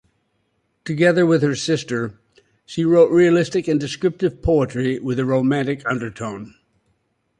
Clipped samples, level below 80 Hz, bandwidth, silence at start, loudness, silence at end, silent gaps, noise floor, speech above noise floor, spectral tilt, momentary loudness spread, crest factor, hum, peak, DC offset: under 0.1%; -44 dBFS; 11 kHz; 0.85 s; -19 LUFS; 0.9 s; none; -68 dBFS; 50 dB; -6.5 dB/octave; 15 LU; 16 dB; none; -2 dBFS; under 0.1%